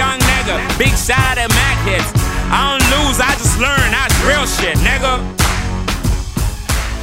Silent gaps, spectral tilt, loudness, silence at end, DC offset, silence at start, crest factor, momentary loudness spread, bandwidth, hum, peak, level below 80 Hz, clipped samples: none; -3.5 dB/octave; -14 LUFS; 0 s; under 0.1%; 0 s; 14 dB; 7 LU; 16.5 kHz; none; 0 dBFS; -20 dBFS; under 0.1%